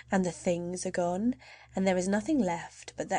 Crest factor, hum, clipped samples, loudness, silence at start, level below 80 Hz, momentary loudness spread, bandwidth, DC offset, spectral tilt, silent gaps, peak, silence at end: 16 dB; none; under 0.1%; -31 LUFS; 0.1 s; -60 dBFS; 11 LU; 10 kHz; under 0.1%; -5.5 dB/octave; none; -14 dBFS; 0 s